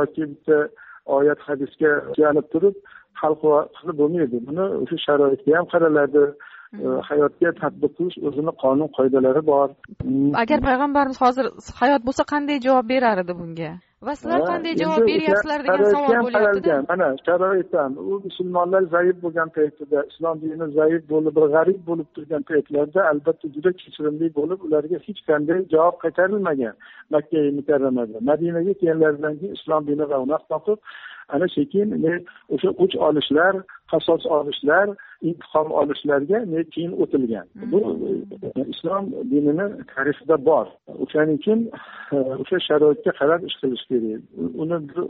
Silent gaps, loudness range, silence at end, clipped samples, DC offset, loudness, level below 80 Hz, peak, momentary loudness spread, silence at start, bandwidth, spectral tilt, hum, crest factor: none; 3 LU; 0 s; under 0.1%; under 0.1%; -21 LUFS; -54 dBFS; -6 dBFS; 10 LU; 0 s; 7.2 kHz; -4.5 dB/octave; none; 16 dB